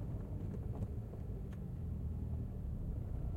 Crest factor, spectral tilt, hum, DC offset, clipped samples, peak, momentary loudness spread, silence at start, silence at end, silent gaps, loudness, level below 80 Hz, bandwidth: 12 dB; -10 dB/octave; none; under 0.1%; under 0.1%; -28 dBFS; 3 LU; 0 s; 0 s; none; -44 LUFS; -46 dBFS; 15.5 kHz